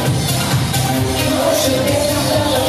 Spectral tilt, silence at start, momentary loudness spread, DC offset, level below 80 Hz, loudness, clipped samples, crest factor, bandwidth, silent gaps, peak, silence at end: -4.5 dB/octave; 0 s; 2 LU; under 0.1%; -34 dBFS; -15 LUFS; under 0.1%; 12 dB; 15.5 kHz; none; -4 dBFS; 0 s